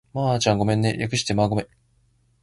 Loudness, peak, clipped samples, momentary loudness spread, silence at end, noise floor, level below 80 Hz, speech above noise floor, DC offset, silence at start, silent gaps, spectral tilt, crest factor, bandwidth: -22 LUFS; -6 dBFS; under 0.1%; 6 LU; 0.8 s; -63 dBFS; -48 dBFS; 41 dB; under 0.1%; 0.15 s; none; -5 dB/octave; 18 dB; 11.5 kHz